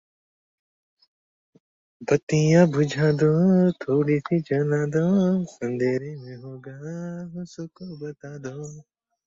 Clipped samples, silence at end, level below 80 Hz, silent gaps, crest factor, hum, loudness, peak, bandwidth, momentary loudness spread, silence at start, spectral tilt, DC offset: under 0.1%; 0.45 s; -62 dBFS; 2.23-2.27 s; 18 dB; none; -22 LUFS; -6 dBFS; 7.6 kHz; 19 LU; 2 s; -7.5 dB/octave; under 0.1%